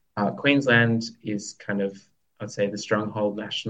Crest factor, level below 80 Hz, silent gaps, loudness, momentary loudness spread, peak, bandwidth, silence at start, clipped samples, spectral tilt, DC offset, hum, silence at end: 20 dB; -68 dBFS; none; -24 LUFS; 13 LU; -6 dBFS; 8.8 kHz; 0.15 s; under 0.1%; -5 dB/octave; under 0.1%; none; 0 s